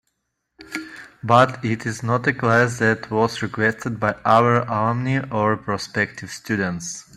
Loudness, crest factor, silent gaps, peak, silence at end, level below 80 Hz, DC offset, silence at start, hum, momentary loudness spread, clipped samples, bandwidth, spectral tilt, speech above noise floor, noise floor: -20 LUFS; 20 dB; none; -2 dBFS; 0.15 s; -56 dBFS; under 0.1%; 0.6 s; none; 15 LU; under 0.1%; 13 kHz; -5.5 dB/octave; 55 dB; -75 dBFS